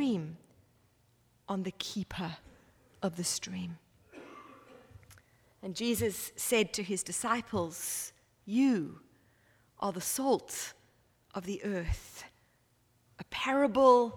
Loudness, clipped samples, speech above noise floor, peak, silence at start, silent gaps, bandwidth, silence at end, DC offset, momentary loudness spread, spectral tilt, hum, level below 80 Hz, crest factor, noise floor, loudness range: -33 LUFS; under 0.1%; 38 dB; -12 dBFS; 0 s; none; 19 kHz; 0 s; under 0.1%; 22 LU; -4 dB/octave; none; -54 dBFS; 22 dB; -70 dBFS; 7 LU